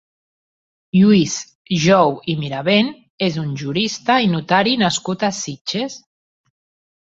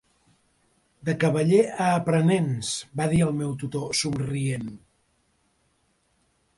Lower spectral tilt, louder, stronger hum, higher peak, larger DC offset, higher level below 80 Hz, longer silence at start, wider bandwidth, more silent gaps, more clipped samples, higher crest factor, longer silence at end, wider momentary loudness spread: about the same, -5 dB/octave vs -5.5 dB/octave; first, -18 LUFS vs -24 LUFS; neither; first, -2 dBFS vs -8 dBFS; neither; about the same, -56 dBFS vs -56 dBFS; about the same, 0.95 s vs 1.05 s; second, 7.8 kHz vs 11.5 kHz; first, 1.55-1.65 s, 3.10-3.18 s, 5.61-5.65 s vs none; neither; about the same, 18 dB vs 18 dB; second, 1.05 s vs 1.8 s; about the same, 11 LU vs 10 LU